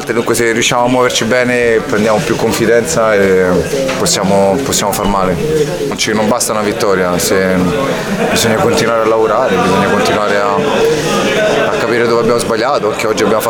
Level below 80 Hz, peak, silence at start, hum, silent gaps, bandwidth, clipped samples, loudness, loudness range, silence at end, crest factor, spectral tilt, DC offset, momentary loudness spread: -36 dBFS; 0 dBFS; 0 s; none; none; 19.5 kHz; under 0.1%; -12 LUFS; 1 LU; 0 s; 12 dB; -4 dB/octave; under 0.1%; 3 LU